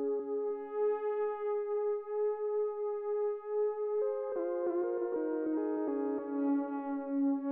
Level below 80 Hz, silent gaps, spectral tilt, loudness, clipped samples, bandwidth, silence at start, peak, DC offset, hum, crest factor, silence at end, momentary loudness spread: -84 dBFS; none; -6 dB/octave; -34 LUFS; under 0.1%; 3 kHz; 0 s; -24 dBFS; under 0.1%; none; 10 dB; 0 s; 3 LU